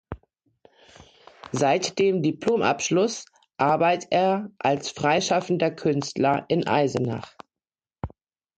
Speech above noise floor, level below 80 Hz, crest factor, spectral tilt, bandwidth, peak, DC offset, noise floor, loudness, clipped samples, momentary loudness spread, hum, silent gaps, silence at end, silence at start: over 67 dB; -54 dBFS; 16 dB; -5 dB/octave; 9.2 kHz; -8 dBFS; under 0.1%; under -90 dBFS; -23 LUFS; under 0.1%; 17 LU; none; none; 0.5 s; 0.1 s